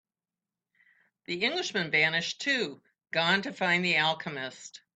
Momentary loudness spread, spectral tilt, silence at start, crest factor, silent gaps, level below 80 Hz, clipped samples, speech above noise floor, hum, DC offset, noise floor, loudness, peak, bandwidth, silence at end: 13 LU; -3.5 dB/octave; 1.3 s; 20 dB; none; -74 dBFS; under 0.1%; over 61 dB; none; under 0.1%; under -90 dBFS; -28 LUFS; -12 dBFS; 9 kHz; 0.2 s